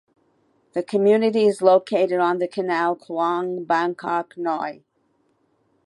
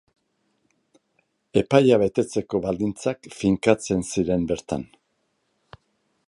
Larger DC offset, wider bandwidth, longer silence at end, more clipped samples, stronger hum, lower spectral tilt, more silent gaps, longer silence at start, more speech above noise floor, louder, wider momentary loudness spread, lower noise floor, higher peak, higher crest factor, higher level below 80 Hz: neither; about the same, 11.5 kHz vs 11.5 kHz; second, 1.15 s vs 1.45 s; neither; neither; about the same, -6 dB/octave vs -6 dB/octave; neither; second, 0.75 s vs 1.55 s; second, 46 dB vs 50 dB; about the same, -21 LUFS vs -23 LUFS; about the same, 9 LU vs 11 LU; second, -66 dBFS vs -72 dBFS; about the same, -2 dBFS vs -2 dBFS; about the same, 20 dB vs 22 dB; second, -78 dBFS vs -50 dBFS